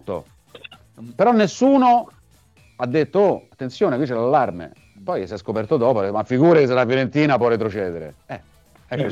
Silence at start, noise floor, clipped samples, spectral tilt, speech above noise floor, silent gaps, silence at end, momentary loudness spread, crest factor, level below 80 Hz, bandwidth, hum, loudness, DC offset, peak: 0.05 s; -54 dBFS; under 0.1%; -7 dB/octave; 35 dB; none; 0 s; 19 LU; 16 dB; -58 dBFS; 9.2 kHz; none; -19 LUFS; under 0.1%; -4 dBFS